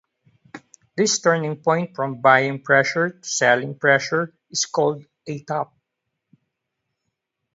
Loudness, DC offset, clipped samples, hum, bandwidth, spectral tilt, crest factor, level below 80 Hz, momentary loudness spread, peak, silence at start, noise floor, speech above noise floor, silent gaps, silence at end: -20 LUFS; under 0.1%; under 0.1%; none; 8 kHz; -3.5 dB/octave; 22 dB; -70 dBFS; 11 LU; 0 dBFS; 0.55 s; -80 dBFS; 59 dB; none; 1.9 s